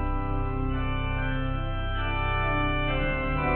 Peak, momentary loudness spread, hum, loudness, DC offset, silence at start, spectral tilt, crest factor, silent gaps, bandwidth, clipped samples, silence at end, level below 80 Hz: -14 dBFS; 4 LU; none; -29 LUFS; under 0.1%; 0 s; -10 dB/octave; 12 dB; none; 4.2 kHz; under 0.1%; 0 s; -30 dBFS